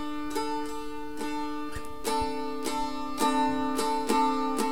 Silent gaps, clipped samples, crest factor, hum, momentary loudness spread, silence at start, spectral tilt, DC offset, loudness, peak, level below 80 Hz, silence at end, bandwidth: none; under 0.1%; 18 dB; none; 11 LU; 0 s; -3.5 dB/octave; 2%; -30 LUFS; -12 dBFS; -50 dBFS; 0 s; 18 kHz